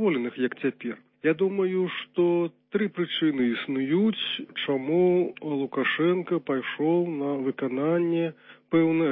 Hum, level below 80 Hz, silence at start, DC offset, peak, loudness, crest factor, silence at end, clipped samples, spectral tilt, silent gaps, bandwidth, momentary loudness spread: none; -74 dBFS; 0 s; under 0.1%; -10 dBFS; -26 LUFS; 14 dB; 0 s; under 0.1%; -10.5 dB/octave; none; 4 kHz; 6 LU